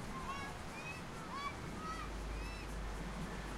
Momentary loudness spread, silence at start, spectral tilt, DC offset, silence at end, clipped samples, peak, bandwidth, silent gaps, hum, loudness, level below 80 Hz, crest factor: 2 LU; 0 s; -4.5 dB/octave; under 0.1%; 0 s; under 0.1%; -30 dBFS; 16 kHz; none; none; -45 LUFS; -50 dBFS; 14 dB